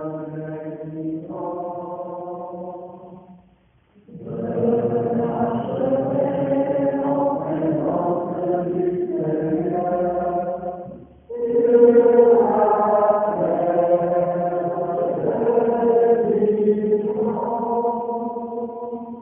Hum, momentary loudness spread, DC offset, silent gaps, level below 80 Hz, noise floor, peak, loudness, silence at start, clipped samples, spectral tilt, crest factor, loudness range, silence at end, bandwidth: none; 15 LU; under 0.1%; none; -58 dBFS; -57 dBFS; -2 dBFS; -20 LUFS; 0 s; under 0.1%; -5.5 dB/octave; 18 dB; 13 LU; 0 s; 3.3 kHz